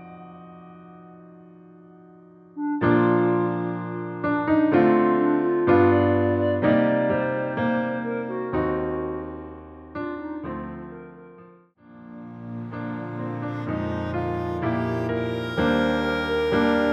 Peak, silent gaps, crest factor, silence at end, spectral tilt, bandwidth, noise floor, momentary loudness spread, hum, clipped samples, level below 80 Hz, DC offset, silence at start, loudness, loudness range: -6 dBFS; none; 18 dB; 0 s; -8.5 dB/octave; 7 kHz; -51 dBFS; 21 LU; none; under 0.1%; -50 dBFS; under 0.1%; 0 s; -23 LUFS; 15 LU